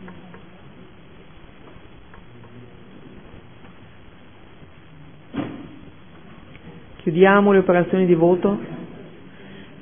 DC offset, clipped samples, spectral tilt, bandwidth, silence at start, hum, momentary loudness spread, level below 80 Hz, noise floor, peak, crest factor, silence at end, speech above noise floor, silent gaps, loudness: 0.5%; under 0.1%; -11.5 dB/octave; 3.6 kHz; 0 s; none; 29 LU; -54 dBFS; -47 dBFS; -2 dBFS; 22 dB; 0.2 s; 31 dB; none; -18 LUFS